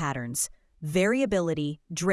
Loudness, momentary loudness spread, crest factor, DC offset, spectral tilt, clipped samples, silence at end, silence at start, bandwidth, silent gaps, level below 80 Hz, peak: -27 LUFS; 8 LU; 14 dB; under 0.1%; -4.5 dB/octave; under 0.1%; 0 s; 0 s; 12 kHz; none; -54 dBFS; -12 dBFS